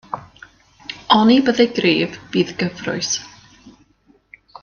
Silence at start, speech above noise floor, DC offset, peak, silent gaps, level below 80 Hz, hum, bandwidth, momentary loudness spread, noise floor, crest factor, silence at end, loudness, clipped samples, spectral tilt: 0.1 s; 40 dB; under 0.1%; 0 dBFS; none; -58 dBFS; none; 7.2 kHz; 19 LU; -57 dBFS; 20 dB; 0.95 s; -17 LUFS; under 0.1%; -4 dB/octave